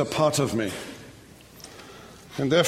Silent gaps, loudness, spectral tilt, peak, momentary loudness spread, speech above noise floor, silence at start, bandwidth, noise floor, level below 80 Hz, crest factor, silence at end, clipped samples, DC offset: none; -26 LUFS; -4.5 dB/octave; -8 dBFS; 24 LU; 25 dB; 0 s; 16 kHz; -48 dBFS; -56 dBFS; 20 dB; 0 s; under 0.1%; under 0.1%